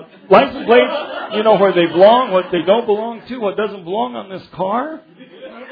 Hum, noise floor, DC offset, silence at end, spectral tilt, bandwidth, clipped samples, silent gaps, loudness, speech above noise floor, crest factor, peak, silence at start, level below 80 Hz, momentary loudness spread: none; -36 dBFS; under 0.1%; 0 s; -8.5 dB/octave; 5 kHz; under 0.1%; none; -15 LUFS; 21 dB; 16 dB; 0 dBFS; 0 s; -56 dBFS; 15 LU